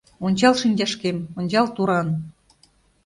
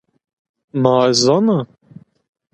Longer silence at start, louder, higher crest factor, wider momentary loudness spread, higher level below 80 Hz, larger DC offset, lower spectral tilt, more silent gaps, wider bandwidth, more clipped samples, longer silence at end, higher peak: second, 0.2 s vs 0.75 s; second, -21 LUFS vs -15 LUFS; about the same, 18 dB vs 18 dB; second, 10 LU vs 13 LU; about the same, -58 dBFS vs -62 dBFS; neither; about the same, -5.5 dB/octave vs -5 dB/octave; neither; about the same, 11.5 kHz vs 11.5 kHz; neither; second, 0.75 s vs 0.9 s; second, -4 dBFS vs 0 dBFS